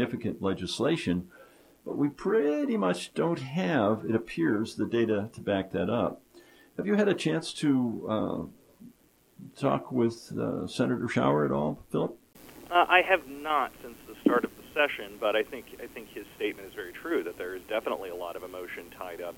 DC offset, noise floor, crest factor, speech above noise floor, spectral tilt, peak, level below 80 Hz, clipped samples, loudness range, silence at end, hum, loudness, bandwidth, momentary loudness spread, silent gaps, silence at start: under 0.1%; -62 dBFS; 24 dB; 33 dB; -6 dB/octave; -6 dBFS; -62 dBFS; under 0.1%; 5 LU; 0 s; none; -29 LUFS; 17 kHz; 14 LU; none; 0 s